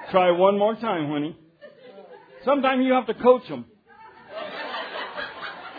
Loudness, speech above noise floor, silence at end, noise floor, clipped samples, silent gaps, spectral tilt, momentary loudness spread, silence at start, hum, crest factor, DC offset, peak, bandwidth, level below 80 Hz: -23 LUFS; 28 dB; 0 s; -49 dBFS; under 0.1%; none; -8.5 dB/octave; 16 LU; 0 s; none; 20 dB; under 0.1%; -4 dBFS; 5 kHz; -68 dBFS